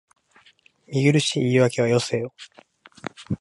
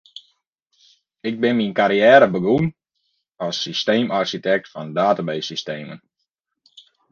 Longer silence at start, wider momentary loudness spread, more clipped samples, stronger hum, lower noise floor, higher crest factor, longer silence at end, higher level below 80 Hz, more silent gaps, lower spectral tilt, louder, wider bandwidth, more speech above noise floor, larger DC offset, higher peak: second, 0.9 s vs 1.25 s; about the same, 19 LU vs 17 LU; neither; neither; second, -57 dBFS vs -77 dBFS; about the same, 18 dB vs 20 dB; second, 0.05 s vs 1.15 s; about the same, -58 dBFS vs -60 dBFS; neither; about the same, -5.5 dB/octave vs -5.5 dB/octave; about the same, -21 LUFS vs -19 LUFS; first, 11.5 kHz vs 7.2 kHz; second, 36 dB vs 59 dB; neither; second, -6 dBFS vs 0 dBFS